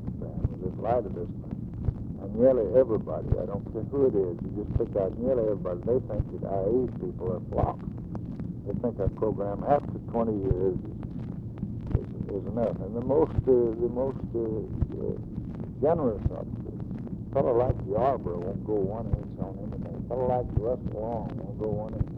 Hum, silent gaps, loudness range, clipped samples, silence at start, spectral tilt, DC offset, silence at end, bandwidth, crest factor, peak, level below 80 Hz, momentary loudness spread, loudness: none; none; 4 LU; under 0.1%; 0 s; -12 dB/octave; under 0.1%; 0 s; 4.6 kHz; 20 dB; -8 dBFS; -42 dBFS; 12 LU; -29 LUFS